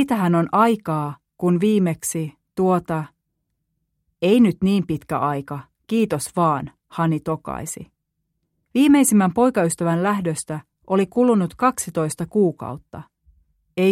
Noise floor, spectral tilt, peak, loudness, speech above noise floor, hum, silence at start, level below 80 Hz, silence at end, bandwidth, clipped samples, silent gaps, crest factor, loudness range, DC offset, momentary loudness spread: -75 dBFS; -6 dB/octave; -4 dBFS; -20 LUFS; 56 dB; none; 0 s; -56 dBFS; 0 s; 16 kHz; under 0.1%; none; 18 dB; 4 LU; under 0.1%; 16 LU